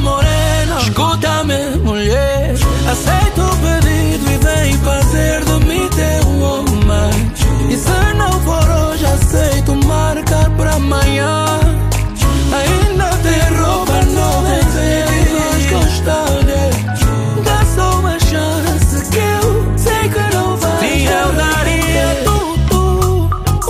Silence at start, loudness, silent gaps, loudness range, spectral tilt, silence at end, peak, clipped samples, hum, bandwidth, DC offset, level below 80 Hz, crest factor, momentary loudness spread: 0 s; -13 LUFS; none; 1 LU; -5 dB/octave; 0 s; 0 dBFS; under 0.1%; none; 16 kHz; under 0.1%; -16 dBFS; 12 dB; 2 LU